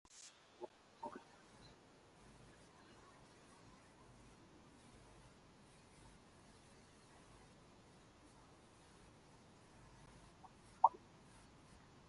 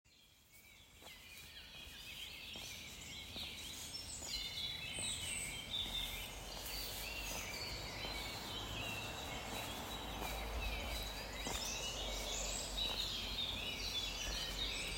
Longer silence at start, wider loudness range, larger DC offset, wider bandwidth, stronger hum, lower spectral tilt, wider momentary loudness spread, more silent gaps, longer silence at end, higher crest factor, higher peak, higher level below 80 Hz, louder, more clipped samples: about the same, 0.05 s vs 0.05 s; first, 19 LU vs 7 LU; neither; second, 11.5 kHz vs 16 kHz; neither; first, -4 dB/octave vs -1.5 dB/octave; about the same, 11 LU vs 11 LU; neither; about the same, 0 s vs 0 s; first, 36 dB vs 18 dB; first, -16 dBFS vs -26 dBFS; second, -74 dBFS vs -52 dBFS; about the same, -43 LUFS vs -42 LUFS; neither